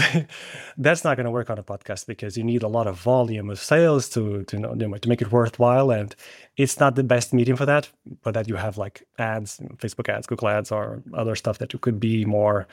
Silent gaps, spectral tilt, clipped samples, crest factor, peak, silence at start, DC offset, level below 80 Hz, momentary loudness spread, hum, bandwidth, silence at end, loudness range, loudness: none; -6 dB/octave; under 0.1%; 18 dB; -4 dBFS; 0 s; under 0.1%; -60 dBFS; 14 LU; none; 16.5 kHz; 0.1 s; 6 LU; -23 LUFS